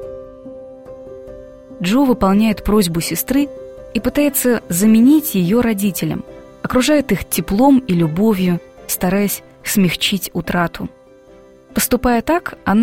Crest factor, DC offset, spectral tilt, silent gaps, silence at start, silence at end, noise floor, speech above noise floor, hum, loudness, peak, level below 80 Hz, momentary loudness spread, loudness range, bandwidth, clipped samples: 14 dB; 0.2%; -5 dB/octave; none; 0 s; 0 s; -44 dBFS; 29 dB; none; -16 LUFS; -2 dBFS; -38 dBFS; 22 LU; 4 LU; 16.5 kHz; under 0.1%